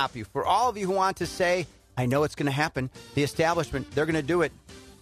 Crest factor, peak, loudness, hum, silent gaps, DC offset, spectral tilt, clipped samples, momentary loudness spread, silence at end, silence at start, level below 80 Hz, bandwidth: 16 dB; -12 dBFS; -27 LUFS; none; none; under 0.1%; -5.5 dB/octave; under 0.1%; 6 LU; 0.1 s; 0 s; -52 dBFS; 14 kHz